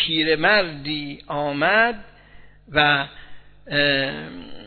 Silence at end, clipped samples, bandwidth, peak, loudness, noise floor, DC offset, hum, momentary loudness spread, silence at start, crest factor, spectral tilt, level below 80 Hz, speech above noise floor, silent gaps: 0 s; under 0.1%; 4.6 kHz; -2 dBFS; -20 LUFS; -46 dBFS; under 0.1%; 50 Hz at -50 dBFS; 14 LU; 0 s; 20 dB; -7 dB/octave; -50 dBFS; 24 dB; none